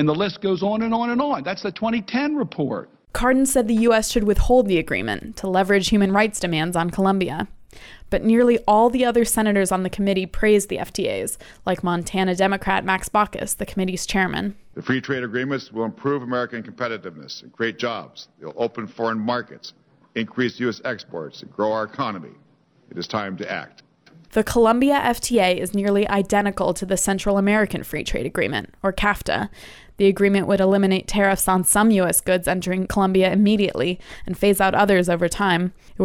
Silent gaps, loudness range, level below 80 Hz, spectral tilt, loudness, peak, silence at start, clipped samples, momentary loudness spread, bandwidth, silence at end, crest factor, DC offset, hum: none; 9 LU; -38 dBFS; -4.5 dB/octave; -21 LUFS; -4 dBFS; 0 s; under 0.1%; 12 LU; 17.5 kHz; 0 s; 16 dB; under 0.1%; none